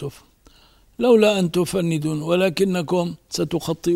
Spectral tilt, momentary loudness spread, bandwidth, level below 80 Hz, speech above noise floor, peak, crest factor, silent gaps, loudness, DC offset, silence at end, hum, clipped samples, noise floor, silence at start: -5.5 dB/octave; 9 LU; 16 kHz; -54 dBFS; 34 dB; -4 dBFS; 16 dB; none; -20 LUFS; under 0.1%; 0 s; none; under 0.1%; -54 dBFS; 0 s